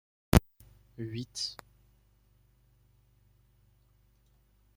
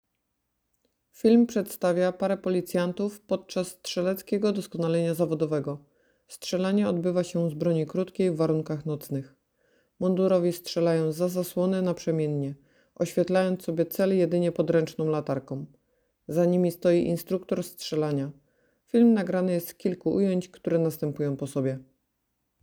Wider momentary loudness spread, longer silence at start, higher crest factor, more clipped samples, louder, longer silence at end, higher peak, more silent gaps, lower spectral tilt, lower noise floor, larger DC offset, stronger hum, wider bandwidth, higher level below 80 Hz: first, 22 LU vs 9 LU; second, 0.35 s vs 1.25 s; first, 32 dB vs 18 dB; neither; second, -31 LUFS vs -27 LUFS; first, 3.25 s vs 0.8 s; first, -4 dBFS vs -10 dBFS; neither; second, -5.5 dB/octave vs -7 dB/octave; second, -67 dBFS vs -79 dBFS; neither; first, 50 Hz at -65 dBFS vs none; second, 16.5 kHz vs over 20 kHz; first, -44 dBFS vs -66 dBFS